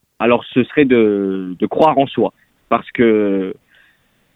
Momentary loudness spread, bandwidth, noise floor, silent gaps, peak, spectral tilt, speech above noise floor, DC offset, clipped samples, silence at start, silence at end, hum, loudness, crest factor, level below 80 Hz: 8 LU; 5 kHz; -57 dBFS; none; 0 dBFS; -8.5 dB/octave; 43 dB; under 0.1%; under 0.1%; 0.2 s; 0.8 s; none; -16 LUFS; 16 dB; -54 dBFS